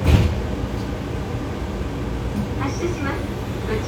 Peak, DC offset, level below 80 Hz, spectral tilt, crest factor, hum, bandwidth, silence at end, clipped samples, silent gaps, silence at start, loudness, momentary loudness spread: 0 dBFS; under 0.1%; -28 dBFS; -7 dB/octave; 22 dB; none; 17.5 kHz; 0 s; under 0.1%; none; 0 s; -25 LUFS; 6 LU